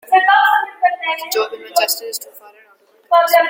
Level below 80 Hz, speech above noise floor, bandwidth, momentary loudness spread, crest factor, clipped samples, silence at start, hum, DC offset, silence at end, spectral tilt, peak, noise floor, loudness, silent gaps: -72 dBFS; 35 dB; 17 kHz; 13 LU; 16 dB; under 0.1%; 0.1 s; none; under 0.1%; 0 s; 1.5 dB/octave; 0 dBFS; -52 dBFS; -15 LUFS; none